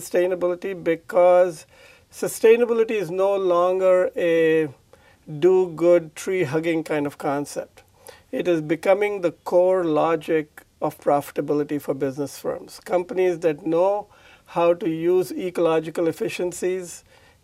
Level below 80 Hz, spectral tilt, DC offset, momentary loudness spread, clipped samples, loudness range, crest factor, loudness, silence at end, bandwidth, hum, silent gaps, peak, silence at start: -64 dBFS; -5.5 dB/octave; under 0.1%; 11 LU; under 0.1%; 4 LU; 18 dB; -22 LUFS; 0.45 s; 15.5 kHz; none; none; -4 dBFS; 0 s